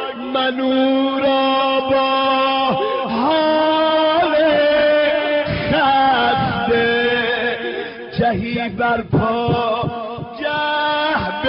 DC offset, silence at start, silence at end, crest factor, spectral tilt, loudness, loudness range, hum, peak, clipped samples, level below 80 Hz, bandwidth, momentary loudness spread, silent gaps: under 0.1%; 0 s; 0 s; 12 dB; -3 dB/octave; -17 LUFS; 4 LU; none; -6 dBFS; under 0.1%; -46 dBFS; 5.6 kHz; 8 LU; none